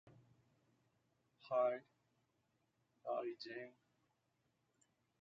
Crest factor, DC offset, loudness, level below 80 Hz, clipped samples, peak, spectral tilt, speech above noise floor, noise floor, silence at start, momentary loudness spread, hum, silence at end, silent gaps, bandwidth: 22 dB; under 0.1%; -44 LUFS; under -90 dBFS; under 0.1%; -26 dBFS; -3 dB/octave; 42 dB; -84 dBFS; 0.05 s; 15 LU; none; 1.5 s; none; 7.4 kHz